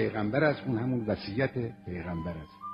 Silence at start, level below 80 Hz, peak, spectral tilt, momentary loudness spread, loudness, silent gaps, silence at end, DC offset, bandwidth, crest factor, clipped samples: 0 s; -54 dBFS; -12 dBFS; -9.5 dB/octave; 11 LU; -31 LUFS; none; 0 s; under 0.1%; 5.4 kHz; 18 dB; under 0.1%